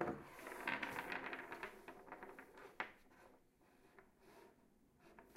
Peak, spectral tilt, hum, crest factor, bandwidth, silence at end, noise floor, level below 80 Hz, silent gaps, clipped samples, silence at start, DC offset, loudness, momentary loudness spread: -24 dBFS; -4.5 dB/octave; none; 28 dB; 16 kHz; 0 s; -72 dBFS; -76 dBFS; none; under 0.1%; 0 s; under 0.1%; -49 LUFS; 23 LU